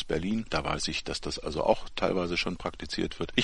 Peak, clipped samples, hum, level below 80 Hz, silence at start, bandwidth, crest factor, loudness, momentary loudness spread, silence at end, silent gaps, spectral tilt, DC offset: -8 dBFS; under 0.1%; none; -44 dBFS; 0 s; 11.5 kHz; 22 dB; -30 LUFS; 6 LU; 0 s; none; -4.5 dB/octave; under 0.1%